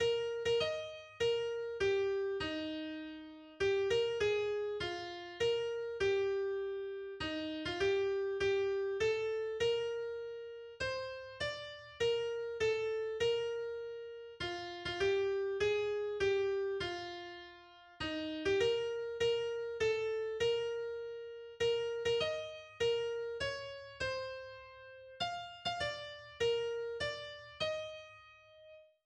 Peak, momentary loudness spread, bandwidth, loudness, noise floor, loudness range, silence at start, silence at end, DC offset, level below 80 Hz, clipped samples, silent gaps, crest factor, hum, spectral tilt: -22 dBFS; 14 LU; 9.8 kHz; -37 LUFS; -59 dBFS; 4 LU; 0 s; 0.25 s; under 0.1%; -64 dBFS; under 0.1%; none; 16 dB; none; -4 dB/octave